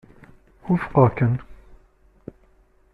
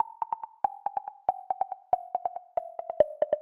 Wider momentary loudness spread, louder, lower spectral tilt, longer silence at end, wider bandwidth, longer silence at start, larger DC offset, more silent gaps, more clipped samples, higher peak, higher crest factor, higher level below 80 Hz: first, 26 LU vs 8 LU; first, -21 LUFS vs -32 LUFS; first, -11 dB/octave vs -7.5 dB/octave; first, 1.4 s vs 0 s; first, 4.4 kHz vs 3.5 kHz; first, 0.65 s vs 0 s; neither; neither; neither; first, -4 dBFS vs -8 dBFS; about the same, 20 dB vs 22 dB; first, -48 dBFS vs -68 dBFS